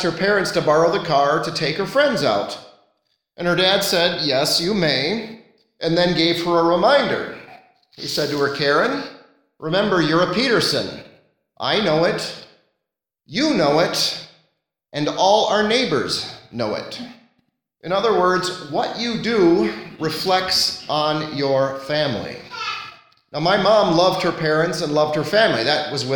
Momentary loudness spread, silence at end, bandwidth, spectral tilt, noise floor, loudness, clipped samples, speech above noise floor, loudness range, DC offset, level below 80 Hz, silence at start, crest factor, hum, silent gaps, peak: 13 LU; 0 s; 19 kHz; -4 dB/octave; -81 dBFS; -19 LUFS; under 0.1%; 63 dB; 3 LU; under 0.1%; -54 dBFS; 0 s; 18 dB; none; none; -2 dBFS